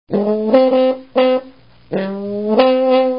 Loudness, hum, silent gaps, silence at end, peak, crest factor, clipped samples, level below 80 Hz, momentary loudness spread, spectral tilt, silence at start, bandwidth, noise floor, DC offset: -15 LUFS; none; none; 0 s; 0 dBFS; 16 dB; under 0.1%; -58 dBFS; 10 LU; -10 dB/octave; 0.1 s; 5.4 kHz; -42 dBFS; 0.4%